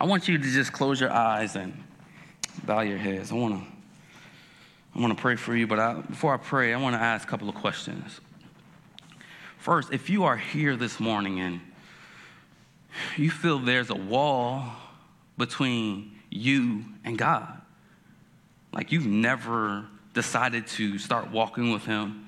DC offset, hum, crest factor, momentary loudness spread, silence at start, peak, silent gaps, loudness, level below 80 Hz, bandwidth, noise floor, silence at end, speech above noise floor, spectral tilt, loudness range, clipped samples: under 0.1%; none; 20 dB; 16 LU; 0 s; -8 dBFS; none; -27 LUFS; -72 dBFS; 13 kHz; -58 dBFS; 0 s; 31 dB; -5 dB/octave; 4 LU; under 0.1%